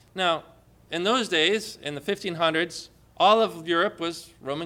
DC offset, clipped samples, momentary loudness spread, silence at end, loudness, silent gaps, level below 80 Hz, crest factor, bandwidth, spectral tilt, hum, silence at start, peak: under 0.1%; under 0.1%; 13 LU; 0 s; -25 LUFS; none; -64 dBFS; 20 dB; 16.5 kHz; -3.5 dB/octave; none; 0.15 s; -6 dBFS